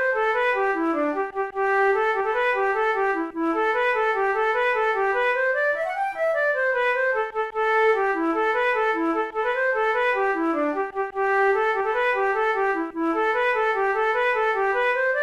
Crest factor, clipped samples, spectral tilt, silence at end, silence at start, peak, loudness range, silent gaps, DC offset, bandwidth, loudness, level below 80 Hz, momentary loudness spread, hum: 12 dB; under 0.1%; -4 dB/octave; 0 s; 0 s; -12 dBFS; 1 LU; none; 0.1%; 12 kHz; -22 LUFS; -56 dBFS; 4 LU; none